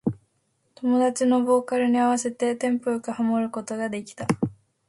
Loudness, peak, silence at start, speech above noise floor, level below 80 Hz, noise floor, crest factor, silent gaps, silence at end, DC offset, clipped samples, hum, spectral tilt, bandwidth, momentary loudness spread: -24 LUFS; -6 dBFS; 0.05 s; 47 dB; -64 dBFS; -70 dBFS; 18 dB; none; 0.35 s; under 0.1%; under 0.1%; none; -5.5 dB/octave; 11.5 kHz; 10 LU